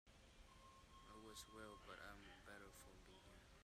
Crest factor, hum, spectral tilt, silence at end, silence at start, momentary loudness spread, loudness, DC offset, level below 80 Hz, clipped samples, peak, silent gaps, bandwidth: 18 dB; none; -3 dB/octave; 0 s; 0.05 s; 8 LU; -62 LUFS; under 0.1%; -72 dBFS; under 0.1%; -44 dBFS; none; 15.5 kHz